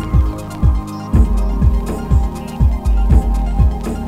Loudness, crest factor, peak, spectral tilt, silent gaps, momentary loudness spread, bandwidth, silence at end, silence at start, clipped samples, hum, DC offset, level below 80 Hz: -17 LUFS; 14 dB; 0 dBFS; -8 dB/octave; none; 5 LU; 11 kHz; 0 s; 0 s; under 0.1%; none; under 0.1%; -16 dBFS